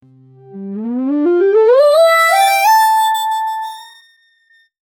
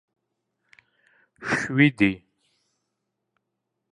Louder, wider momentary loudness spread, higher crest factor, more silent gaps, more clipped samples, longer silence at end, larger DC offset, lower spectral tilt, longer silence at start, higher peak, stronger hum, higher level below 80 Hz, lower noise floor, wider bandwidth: first, -12 LUFS vs -22 LUFS; about the same, 17 LU vs 18 LU; second, 12 dB vs 24 dB; neither; neither; second, 1.15 s vs 1.75 s; neither; second, -3 dB/octave vs -6 dB/octave; second, 0.5 s vs 1.4 s; about the same, -2 dBFS vs -4 dBFS; neither; second, -70 dBFS vs -60 dBFS; second, -54 dBFS vs -81 dBFS; first, 18.5 kHz vs 10.5 kHz